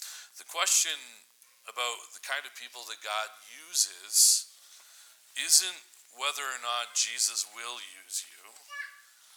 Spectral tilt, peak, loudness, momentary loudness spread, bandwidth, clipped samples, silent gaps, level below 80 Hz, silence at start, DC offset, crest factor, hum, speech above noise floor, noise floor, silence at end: 5.5 dB/octave; -6 dBFS; -27 LUFS; 20 LU; over 20 kHz; under 0.1%; none; under -90 dBFS; 0 s; under 0.1%; 26 dB; none; 25 dB; -56 dBFS; 0.4 s